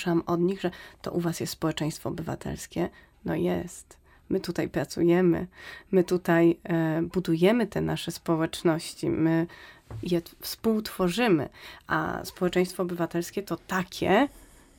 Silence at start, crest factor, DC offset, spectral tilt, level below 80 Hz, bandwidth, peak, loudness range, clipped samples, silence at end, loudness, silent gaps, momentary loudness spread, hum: 0 s; 18 dB; under 0.1%; -6 dB/octave; -54 dBFS; 17 kHz; -10 dBFS; 6 LU; under 0.1%; 0.4 s; -27 LUFS; none; 11 LU; none